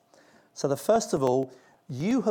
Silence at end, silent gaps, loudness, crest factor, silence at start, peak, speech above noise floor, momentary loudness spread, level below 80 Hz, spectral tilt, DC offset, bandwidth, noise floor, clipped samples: 0 s; none; -27 LUFS; 18 dB; 0.55 s; -10 dBFS; 33 dB; 14 LU; -64 dBFS; -6 dB/octave; under 0.1%; 18.5 kHz; -59 dBFS; under 0.1%